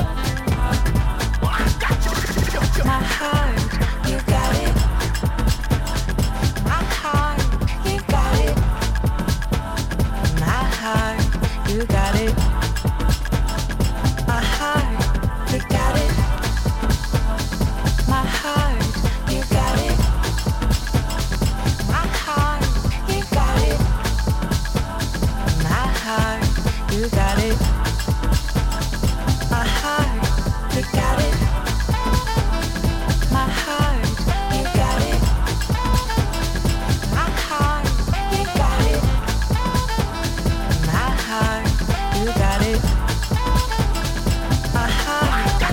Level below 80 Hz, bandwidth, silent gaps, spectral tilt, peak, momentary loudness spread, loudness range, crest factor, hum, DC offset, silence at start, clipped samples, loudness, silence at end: -22 dBFS; 17 kHz; none; -5 dB/octave; -4 dBFS; 4 LU; 1 LU; 14 dB; none; under 0.1%; 0 s; under 0.1%; -21 LUFS; 0 s